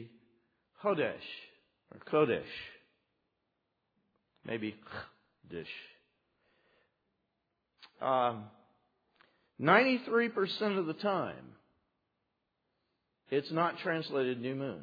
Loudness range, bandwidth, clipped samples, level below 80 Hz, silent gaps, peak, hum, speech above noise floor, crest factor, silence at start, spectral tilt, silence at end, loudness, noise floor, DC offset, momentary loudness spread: 14 LU; 5 kHz; under 0.1%; -78 dBFS; none; -10 dBFS; none; 50 dB; 26 dB; 0 s; -3.5 dB/octave; 0 s; -33 LUFS; -83 dBFS; under 0.1%; 18 LU